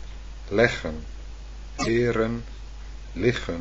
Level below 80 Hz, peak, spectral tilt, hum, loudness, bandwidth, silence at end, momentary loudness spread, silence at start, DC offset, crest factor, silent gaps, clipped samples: -38 dBFS; -4 dBFS; -5.5 dB/octave; none; -25 LUFS; 8.4 kHz; 0 s; 20 LU; 0 s; under 0.1%; 24 dB; none; under 0.1%